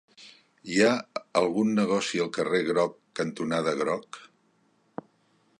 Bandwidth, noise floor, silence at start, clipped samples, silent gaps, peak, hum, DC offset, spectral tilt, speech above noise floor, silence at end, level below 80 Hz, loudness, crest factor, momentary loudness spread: 11.5 kHz; -67 dBFS; 0.2 s; under 0.1%; none; -8 dBFS; none; under 0.1%; -5 dB/octave; 41 dB; 1.35 s; -70 dBFS; -27 LUFS; 20 dB; 20 LU